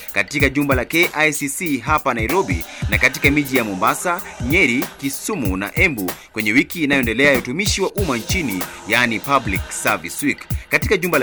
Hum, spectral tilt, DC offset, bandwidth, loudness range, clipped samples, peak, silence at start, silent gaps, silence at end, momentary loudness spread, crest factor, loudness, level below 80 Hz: none; -4 dB/octave; under 0.1%; over 20 kHz; 2 LU; under 0.1%; 0 dBFS; 0 s; none; 0 s; 8 LU; 18 dB; -18 LUFS; -34 dBFS